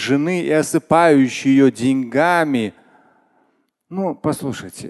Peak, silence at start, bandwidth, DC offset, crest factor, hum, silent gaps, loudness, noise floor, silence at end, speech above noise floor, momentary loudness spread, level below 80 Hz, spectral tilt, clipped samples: 0 dBFS; 0 s; 12.5 kHz; under 0.1%; 18 dB; none; none; -17 LUFS; -64 dBFS; 0 s; 47 dB; 12 LU; -56 dBFS; -5.5 dB/octave; under 0.1%